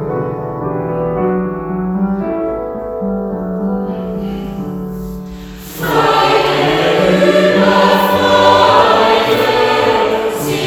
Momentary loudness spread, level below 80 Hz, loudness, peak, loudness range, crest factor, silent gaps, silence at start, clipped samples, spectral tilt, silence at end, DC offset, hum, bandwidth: 14 LU; -38 dBFS; -13 LUFS; 0 dBFS; 10 LU; 14 dB; none; 0 s; 0.1%; -5.5 dB/octave; 0 s; under 0.1%; none; over 20 kHz